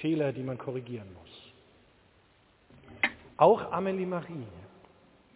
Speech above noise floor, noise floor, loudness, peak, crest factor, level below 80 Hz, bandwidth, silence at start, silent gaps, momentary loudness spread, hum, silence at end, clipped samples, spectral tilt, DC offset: 34 dB; -64 dBFS; -29 LUFS; -8 dBFS; 24 dB; -66 dBFS; 4 kHz; 0 s; none; 26 LU; none; 0.7 s; under 0.1%; -5 dB/octave; under 0.1%